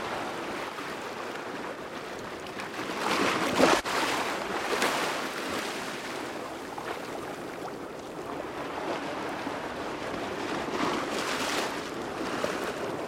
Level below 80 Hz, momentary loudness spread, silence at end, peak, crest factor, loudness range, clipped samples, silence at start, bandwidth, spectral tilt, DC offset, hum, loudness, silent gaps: -62 dBFS; 11 LU; 0 s; -8 dBFS; 24 dB; 8 LU; under 0.1%; 0 s; 16 kHz; -3 dB/octave; under 0.1%; none; -31 LUFS; none